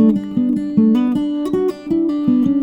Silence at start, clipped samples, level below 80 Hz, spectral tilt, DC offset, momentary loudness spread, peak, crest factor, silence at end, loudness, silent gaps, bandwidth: 0 s; under 0.1%; -52 dBFS; -9 dB/octave; under 0.1%; 5 LU; -4 dBFS; 12 dB; 0 s; -17 LUFS; none; 10.5 kHz